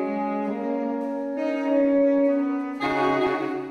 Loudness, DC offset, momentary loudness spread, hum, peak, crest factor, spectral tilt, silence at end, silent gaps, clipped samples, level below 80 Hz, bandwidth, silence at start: -24 LUFS; under 0.1%; 8 LU; none; -12 dBFS; 12 dB; -7 dB/octave; 0 s; none; under 0.1%; -64 dBFS; 6.6 kHz; 0 s